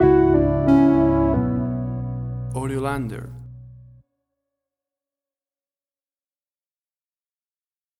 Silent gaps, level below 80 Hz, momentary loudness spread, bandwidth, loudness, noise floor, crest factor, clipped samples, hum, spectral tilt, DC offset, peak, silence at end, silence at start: none; -38 dBFS; 15 LU; 12 kHz; -20 LUFS; under -90 dBFS; 18 dB; under 0.1%; none; -9 dB/octave; under 0.1%; -4 dBFS; 4.25 s; 0 s